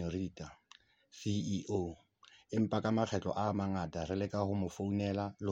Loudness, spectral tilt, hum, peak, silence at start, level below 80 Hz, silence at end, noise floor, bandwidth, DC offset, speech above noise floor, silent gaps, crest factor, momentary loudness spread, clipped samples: -37 LUFS; -7 dB/octave; none; -18 dBFS; 0 s; -62 dBFS; 0 s; -65 dBFS; 8.2 kHz; under 0.1%; 29 dB; none; 18 dB; 10 LU; under 0.1%